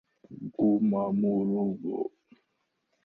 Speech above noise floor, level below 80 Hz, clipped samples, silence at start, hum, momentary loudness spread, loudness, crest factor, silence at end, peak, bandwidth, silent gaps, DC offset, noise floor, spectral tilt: 51 dB; -68 dBFS; under 0.1%; 0.3 s; none; 13 LU; -28 LUFS; 14 dB; 0.95 s; -16 dBFS; 2.7 kHz; none; under 0.1%; -78 dBFS; -13 dB/octave